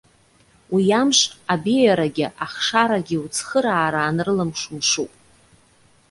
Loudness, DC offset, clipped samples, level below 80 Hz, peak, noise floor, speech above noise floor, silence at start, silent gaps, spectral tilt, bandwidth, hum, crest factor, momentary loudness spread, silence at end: -20 LUFS; under 0.1%; under 0.1%; -58 dBFS; -2 dBFS; -56 dBFS; 36 dB; 0.7 s; none; -3.5 dB/octave; 11.5 kHz; none; 18 dB; 8 LU; 1.05 s